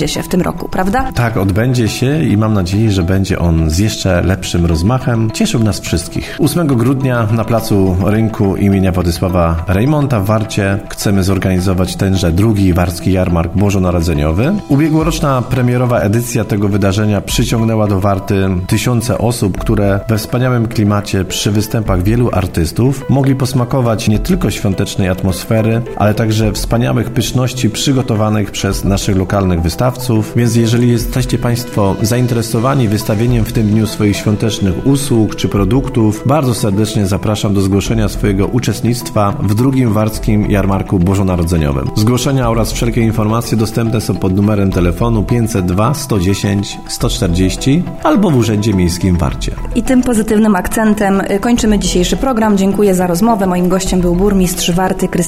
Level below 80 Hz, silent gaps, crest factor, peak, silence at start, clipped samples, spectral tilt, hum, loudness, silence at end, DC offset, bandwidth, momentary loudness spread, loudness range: -26 dBFS; none; 12 dB; 0 dBFS; 0 s; under 0.1%; -6 dB/octave; none; -13 LUFS; 0 s; under 0.1%; 16.5 kHz; 3 LU; 2 LU